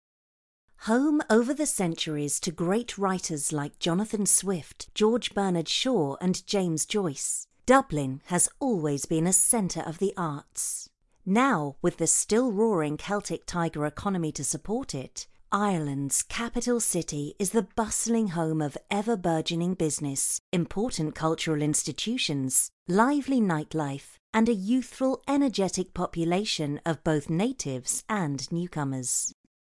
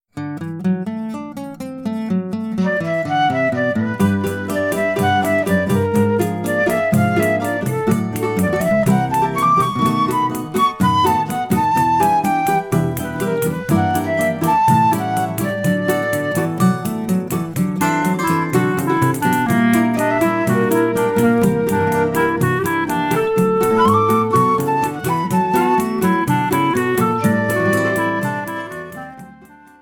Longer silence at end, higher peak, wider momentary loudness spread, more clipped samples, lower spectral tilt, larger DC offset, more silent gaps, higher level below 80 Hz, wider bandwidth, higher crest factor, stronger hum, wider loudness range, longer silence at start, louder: about the same, 0.35 s vs 0.35 s; second, -6 dBFS vs -2 dBFS; about the same, 8 LU vs 7 LU; neither; second, -4 dB/octave vs -6 dB/octave; neither; first, 20.40-20.52 s, 22.73-22.86 s, 24.19-24.33 s vs none; about the same, -54 dBFS vs -50 dBFS; second, 12 kHz vs 19 kHz; first, 22 dB vs 14 dB; neither; about the same, 3 LU vs 3 LU; first, 0.8 s vs 0.15 s; second, -27 LUFS vs -17 LUFS